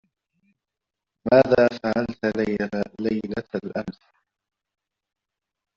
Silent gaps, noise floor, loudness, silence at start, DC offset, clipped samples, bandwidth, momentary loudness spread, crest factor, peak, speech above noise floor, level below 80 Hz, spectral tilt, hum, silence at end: none; -86 dBFS; -23 LUFS; 1.25 s; under 0.1%; under 0.1%; 7.4 kHz; 14 LU; 22 dB; -4 dBFS; 64 dB; -56 dBFS; -5.5 dB/octave; none; 1.85 s